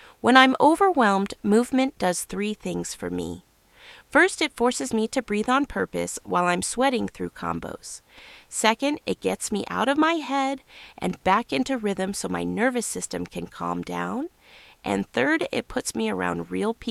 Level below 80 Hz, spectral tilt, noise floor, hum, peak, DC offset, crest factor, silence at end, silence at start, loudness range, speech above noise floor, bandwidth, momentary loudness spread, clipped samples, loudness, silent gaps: -54 dBFS; -4 dB/octave; -52 dBFS; none; -2 dBFS; under 0.1%; 22 dB; 0 s; 0.05 s; 4 LU; 28 dB; 15 kHz; 13 LU; under 0.1%; -24 LUFS; none